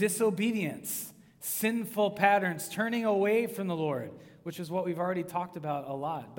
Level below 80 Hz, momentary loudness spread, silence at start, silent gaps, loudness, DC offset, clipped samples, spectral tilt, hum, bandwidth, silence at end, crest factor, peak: -76 dBFS; 11 LU; 0 s; none; -31 LUFS; under 0.1%; under 0.1%; -4.5 dB/octave; none; 18 kHz; 0 s; 22 dB; -8 dBFS